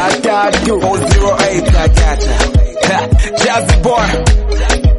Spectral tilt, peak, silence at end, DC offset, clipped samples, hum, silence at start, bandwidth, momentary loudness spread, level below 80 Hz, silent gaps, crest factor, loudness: -5 dB/octave; 0 dBFS; 0 s; under 0.1%; under 0.1%; none; 0 s; 11.5 kHz; 3 LU; -14 dBFS; none; 10 dB; -12 LUFS